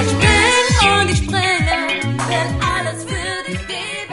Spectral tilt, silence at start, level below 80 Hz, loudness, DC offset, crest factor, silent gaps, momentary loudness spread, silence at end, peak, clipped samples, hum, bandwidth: -3.5 dB/octave; 0 s; -28 dBFS; -16 LUFS; 0.1%; 16 dB; none; 12 LU; 0 s; 0 dBFS; under 0.1%; none; 11.5 kHz